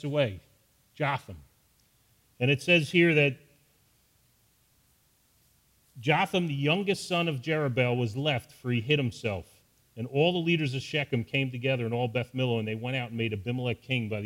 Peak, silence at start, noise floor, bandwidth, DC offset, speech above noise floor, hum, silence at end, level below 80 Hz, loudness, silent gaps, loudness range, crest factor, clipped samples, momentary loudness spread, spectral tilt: -10 dBFS; 0.05 s; -67 dBFS; 16 kHz; under 0.1%; 39 dB; none; 0 s; -64 dBFS; -28 LUFS; none; 4 LU; 20 dB; under 0.1%; 10 LU; -6 dB/octave